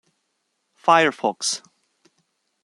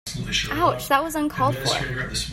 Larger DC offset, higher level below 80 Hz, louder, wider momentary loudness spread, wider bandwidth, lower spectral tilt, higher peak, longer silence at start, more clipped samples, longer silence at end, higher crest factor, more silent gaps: neither; second, -72 dBFS vs -40 dBFS; first, -20 LUFS vs -23 LUFS; first, 9 LU vs 5 LU; second, 12.5 kHz vs 16.5 kHz; second, -2.5 dB/octave vs -4 dB/octave; first, -2 dBFS vs -6 dBFS; first, 0.85 s vs 0.05 s; neither; first, 1.05 s vs 0 s; about the same, 22 dB vs 18 dB; neither